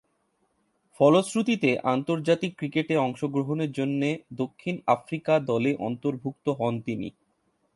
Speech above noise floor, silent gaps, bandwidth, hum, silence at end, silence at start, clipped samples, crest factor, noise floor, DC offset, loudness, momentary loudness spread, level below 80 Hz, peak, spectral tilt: 46 dB; none; 11.5 kHz; none; 0.65 s; 1 s; under 0.1%; 20 dB; -72 dBFS; under 0.1%; -26 LUFS; 9 LU; -68 dBFS; -6 dBFS; -6.5 dB/octave